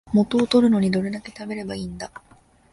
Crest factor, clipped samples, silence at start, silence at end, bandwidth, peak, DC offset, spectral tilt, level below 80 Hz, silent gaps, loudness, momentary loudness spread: 16 dB; under 0.1%; 0.05 s; 0.55 s; 11.5 kHz; -6 dBFS; under 0.1%; -6.5 dB/octave; -52 dBFS; none; -21 LUFS; 16 LU